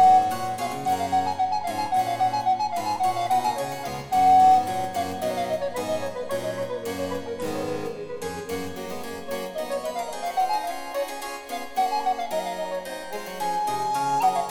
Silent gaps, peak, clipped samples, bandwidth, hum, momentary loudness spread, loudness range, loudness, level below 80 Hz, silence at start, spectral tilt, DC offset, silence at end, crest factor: none; -8 dBFS; under 0.1%; 18 kHz; none; 11 LU; 9 LU; -26 LUFS; -58 dBFS; 0 s; -4 dB/octave; under 0.1%; 0 s; 16 dB